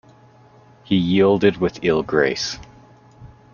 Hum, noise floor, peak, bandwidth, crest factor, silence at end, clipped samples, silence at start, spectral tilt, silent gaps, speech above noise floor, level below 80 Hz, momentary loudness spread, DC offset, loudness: none; -49 dBFS; -4 dBFS; 7.2 kHz; 18 dB; 0.25 s; under 0.1%; 0.9 s; -5.5 dB/octave; none; 31 dB; -50 dBFS; 9 LU; under 0.1%; -19 LUFS